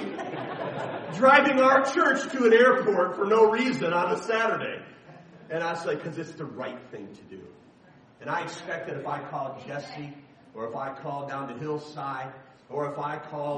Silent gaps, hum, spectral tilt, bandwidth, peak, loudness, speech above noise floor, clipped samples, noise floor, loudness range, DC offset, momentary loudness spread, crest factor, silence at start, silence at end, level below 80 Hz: none; none; -5 dB/octave; 9.8 kHz; -4 dBFS; -25 LUFS; 30 dB; under 0.1%; -55 dBFS; 15 LU; under 0.1%; 20 LU; 22 dB; 0 s; 0 s; -74 dBFS